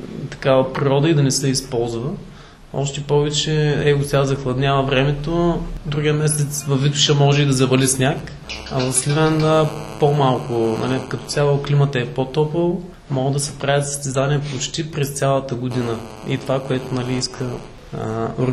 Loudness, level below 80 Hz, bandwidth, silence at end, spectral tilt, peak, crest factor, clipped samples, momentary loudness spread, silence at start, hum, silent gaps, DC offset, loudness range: -19 LUFS; -40 dBFS; 13 kHz; 0 s; -5 dB/octave; -2 dBFS; 18 dB; under 0.1%; 10 LU; 0 s; none; none; under 0.1%; 5 LU